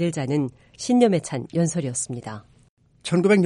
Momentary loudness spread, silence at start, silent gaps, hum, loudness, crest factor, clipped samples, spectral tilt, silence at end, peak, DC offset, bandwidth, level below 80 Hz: 16 LU; 0 s; 2.69-2.77 s; none; -23 LUFS; 18 dB; under 0.1%; -5.5 dB/octave; 0 s; -4 dBFS; under 0.1%; 11.5 kHz; -60 dBFS